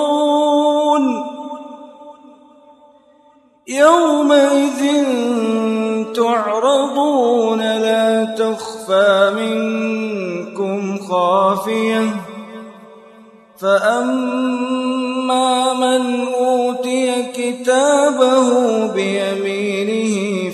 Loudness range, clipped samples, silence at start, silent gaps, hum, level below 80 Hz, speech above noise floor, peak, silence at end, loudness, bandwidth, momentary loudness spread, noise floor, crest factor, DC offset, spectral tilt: 4 LU; under 0.1%; 0 s; none; none; -70 dBFS; 36 dB; 0 dBFS; 0 s; -16 LUFS; 13 kHz; 10 LU; -51 dBFS; 16 dB; under 0.1%; -4.5 dB/octave